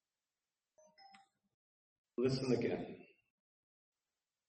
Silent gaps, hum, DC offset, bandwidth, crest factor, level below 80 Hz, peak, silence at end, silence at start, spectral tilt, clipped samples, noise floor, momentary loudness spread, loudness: 1.54-2.04 s; none; under 0.1%; 8.4 kHz; 22 dB; -76 dBFS; -22 dBFS; 1.45 s; 1 s; -6.5 dB/octave; under 0.1%; under -90 dBFS; 15 LU; -38 LUFS